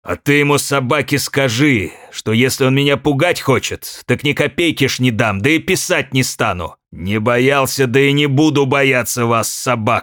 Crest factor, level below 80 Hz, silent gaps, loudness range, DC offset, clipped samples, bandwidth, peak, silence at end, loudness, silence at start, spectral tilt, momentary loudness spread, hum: 14 dB; -50 dBFS; none; 2 LU; under 0.1%; under 0.1%; 19 kHz; -2 dBFS; 0 s; -14 LUFS; 0.05 s; -4.5 dB/octave; 6 LU; none